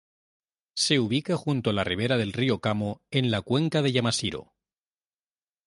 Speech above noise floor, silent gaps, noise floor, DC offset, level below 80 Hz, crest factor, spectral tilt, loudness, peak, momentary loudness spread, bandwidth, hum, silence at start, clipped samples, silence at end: over 64 dB; none; under -90 dBFS; under 0.1%; -56 dBFS; 18 dB; -5 dB/octave; -26 LUFS; -8 dBFS; 5 LU; 11.5 kHz; none; 0.75 s; under 0.1%; 1.25 s